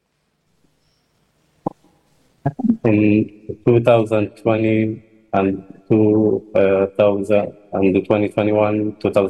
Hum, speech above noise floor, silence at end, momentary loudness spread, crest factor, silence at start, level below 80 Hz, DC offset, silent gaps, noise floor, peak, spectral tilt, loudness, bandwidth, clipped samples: none; 51 dB; 0 s; 12 LU; 18 dB; 1.65 s; -54 dBFS; under 0.1%; none; -67 dBFS; 0 dBFS; -9 dB/octave; -17 LUFS; 10 kHz; under 0.1%